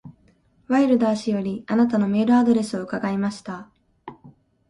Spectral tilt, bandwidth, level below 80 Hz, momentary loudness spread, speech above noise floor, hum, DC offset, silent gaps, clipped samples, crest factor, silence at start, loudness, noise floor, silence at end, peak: -7 dB/octave; 11 kHz; -60 dBFS; 15 LU; 39 dB; none; under 0.1%; none; under 0.1%; 16 dB; 0.05 s; -21 LUFS; -59 dBFS; 0.4 s; -8 dBFS